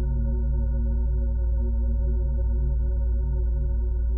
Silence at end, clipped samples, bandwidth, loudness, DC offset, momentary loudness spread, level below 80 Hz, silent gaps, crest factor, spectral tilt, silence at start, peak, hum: 0 s; under 0.1%; 1.6 kHz; -27 LUFS; under 0.1%; 1 LU; -24 dBFS; none; 8 dB; -14 dB/octave; 0 s; -16 dBFS; none